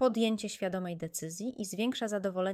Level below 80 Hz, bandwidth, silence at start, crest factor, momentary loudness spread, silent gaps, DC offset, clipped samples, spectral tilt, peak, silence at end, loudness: -72 dBFS; 16 kHz; 0 s; 16 dB; 7 LU; none; under 0.1%; under 0.1%; -4.5 dB/octave; -16 dBFS; 0 s; -34 LUFS